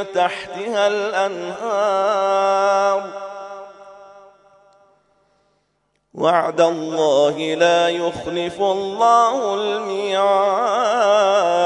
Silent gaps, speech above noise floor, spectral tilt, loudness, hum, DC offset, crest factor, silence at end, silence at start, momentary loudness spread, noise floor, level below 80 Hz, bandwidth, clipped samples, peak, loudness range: none; 50 dB; -3.5 dB/octave; -18 LUFS; none; under 0.1%; 16 dB; 0 s; 0 s; 9 LU; -68 dBFS; -64 dBFS; 10.5 kHz; under 0.1%; -2 dBFS; 9 LU